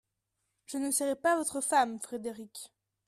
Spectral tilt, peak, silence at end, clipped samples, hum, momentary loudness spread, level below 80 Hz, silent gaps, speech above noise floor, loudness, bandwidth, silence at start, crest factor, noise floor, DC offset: -2 dB/octave; -14 dBFS; 0.4 s; under 0.1%; none; 17 LU; -76 dBFS; none; 51 dB; -31 LUFS; 14.5 kHz; 0.7 s; 18 dB; -83 dBFS; under 0.1%